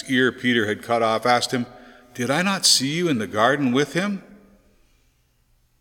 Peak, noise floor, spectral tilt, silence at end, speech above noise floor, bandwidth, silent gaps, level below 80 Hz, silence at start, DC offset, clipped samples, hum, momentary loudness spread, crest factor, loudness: -4 dBFS; -63 dBFS; -3 dB/octave; 1.45 s; 42 dB; 17.5 kHz; none; -62 dBFS; 0 s; under 0.1%; under 0.1%; none; 12 LU; 20 dB; -20 LUFS